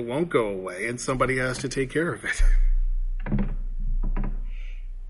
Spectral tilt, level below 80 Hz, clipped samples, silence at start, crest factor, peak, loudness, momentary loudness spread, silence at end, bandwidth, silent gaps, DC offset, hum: -5.5 dB/octave; -26 dBFS; under 0.1%; 0 s; 16 dB; -8 dBFS; -28 LUFS; 11 LU; 0 s; 11.5 kHz; none; under 0.1%; none